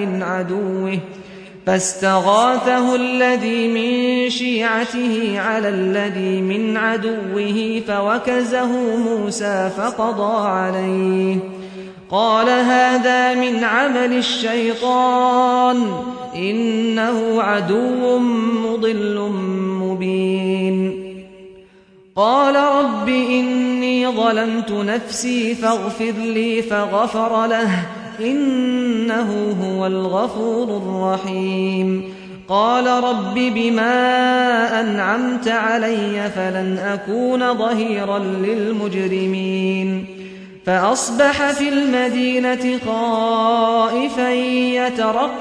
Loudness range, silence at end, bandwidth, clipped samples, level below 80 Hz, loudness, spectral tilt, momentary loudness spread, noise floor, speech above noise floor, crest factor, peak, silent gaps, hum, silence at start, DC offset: 3 LU; 0 s; 10.5 kHz; under 0.1%; -58 dBFS; -18 LUFS; -5 dB/octave; 7 LU; -48 dBFS; 31 dB; 16 dB; -2 dBFS; none; none; 0 s; under 0.1%